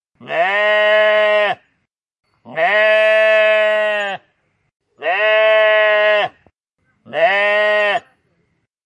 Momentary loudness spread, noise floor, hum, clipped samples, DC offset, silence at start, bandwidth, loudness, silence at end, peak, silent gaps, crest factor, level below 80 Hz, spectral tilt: 12 LU; -69 dBFS; none; under 0.1%; under 0.1%; 0.2 s; 8.4 kHz; -14 LUFS; 0.85 s; -2 dBFS; 2.19-2.23 s; 14 dB; -76 dBFS; -3 dB/octave